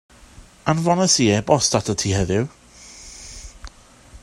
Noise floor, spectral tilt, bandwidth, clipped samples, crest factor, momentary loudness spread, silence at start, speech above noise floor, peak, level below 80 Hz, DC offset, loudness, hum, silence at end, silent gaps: -46 dBFS; -4 dB/octave; 13 kHz; under 0.1%; 20 dB; 22 LU; 0.4 s; 27 dB; 0 dBFS; -44 dBFS; under 0.1%; -19 LUFS; none; 0.05 s; none